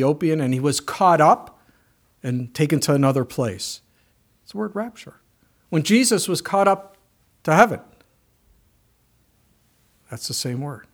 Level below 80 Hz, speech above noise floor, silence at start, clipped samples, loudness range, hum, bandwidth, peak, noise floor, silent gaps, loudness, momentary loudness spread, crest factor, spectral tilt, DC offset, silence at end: -62 dBFS; 42 dB; 0 s; under 0.1%; 5 LU; none; over 20 kHz; 0 dBFS; -62 dBFS; none; -20 LUFS; 15 LU; 22 dB; -5 dB/octave; under 0.1%; 0.1 s